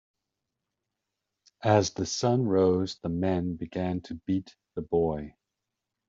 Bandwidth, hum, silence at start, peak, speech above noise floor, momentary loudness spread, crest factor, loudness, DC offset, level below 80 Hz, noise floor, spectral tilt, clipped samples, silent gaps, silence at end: 7.8 kHz; none; 1.6 s; -8 dBFS; 59 dB; 11 LU; 22 dB; -28 LUFS; under 0.1%; -58 dBFS; -86 dBFS; -6.5 dB/octave; under 0.1%; none; 0.8 s